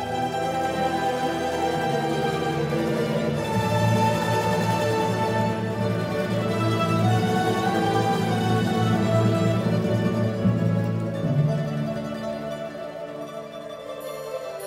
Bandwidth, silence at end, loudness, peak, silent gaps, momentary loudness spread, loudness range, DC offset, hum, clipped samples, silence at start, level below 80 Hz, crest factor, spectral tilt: 16 kHz; 0 s; -24 LUFS; -10 dBFS; none; 11 LU; 4 LU; under 0.1%; none; under 0.1%; 0 s; -52 dBFS; 14 dB; -6.5 dB/octave